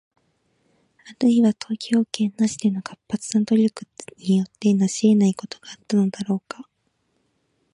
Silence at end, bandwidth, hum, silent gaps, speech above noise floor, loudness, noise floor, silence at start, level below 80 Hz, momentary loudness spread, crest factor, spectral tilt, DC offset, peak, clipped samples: 1.1 s; 11 kHz; none; none; 49 dB; -22 LUFS; -70 dBFS; 1.05 s; -68 dBFS; 17 LU; 18 dB; -6 dB/octave; under 0.1%; -4 dBFS; under 0.1%